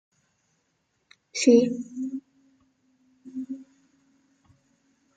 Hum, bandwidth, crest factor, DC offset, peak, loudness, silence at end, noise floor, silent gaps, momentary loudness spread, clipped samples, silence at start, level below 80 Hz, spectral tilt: none; 9.2 kHz; 24 dB; under 0.1%; -6 dBFS; -24 LUFS; 1.55 s; -74 dBFS; none; 21 LU; under 0.1%; 1.35 s; -78 dBFS; -4 dB/octave